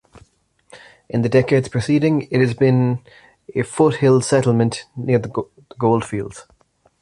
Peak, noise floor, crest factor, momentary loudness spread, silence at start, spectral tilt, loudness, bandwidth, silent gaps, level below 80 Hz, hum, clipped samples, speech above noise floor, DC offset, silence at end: -2 dBFS; -57 dBFS; 16 dB; 12 LU; 0.15 s; -7 dB/octave; -18 LUFS; 11.5 kHz; none; -52 dBFS; none; under 0.1%; 39 dB; under 0.1%; 0.6 s